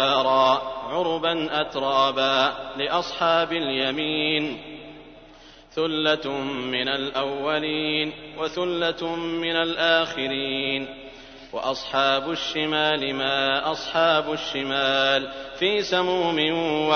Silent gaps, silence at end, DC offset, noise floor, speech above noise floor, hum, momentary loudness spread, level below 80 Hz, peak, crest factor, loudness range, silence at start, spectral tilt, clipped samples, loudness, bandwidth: none; 0 s; under 0.1%; -48 dBFS; 24 dB; none; 9 LU; -56 dBFS; -6 dBFS; 18 dB; 3 LU; 0 s; -4 dB/octave; under 0.1%; -23 LUFS; 6.6 kHz